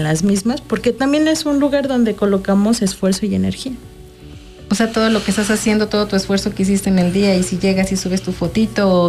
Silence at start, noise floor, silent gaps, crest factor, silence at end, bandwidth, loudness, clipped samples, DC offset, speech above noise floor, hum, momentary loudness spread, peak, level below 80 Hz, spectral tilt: 0 s; -37 dBFS; none; 12 dB; 0 s; 14.5 kHz; -16 LUFS; under 0.1%; under 0.1%; 21 dB; none; 5 LU; -4 dBFS; -40 dBFS; -5.5 dB/octave